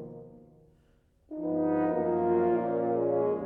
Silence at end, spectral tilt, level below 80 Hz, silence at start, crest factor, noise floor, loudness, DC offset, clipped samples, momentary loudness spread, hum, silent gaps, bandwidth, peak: 0 s; -11.5 dB/octave; -66 dBFS; 0 s; 14 dB; -65 dBFS; -28 LUFS; under 0.1%; under 0.1%; 16 LU; none; none; 3.4 kHz; -16 dBFS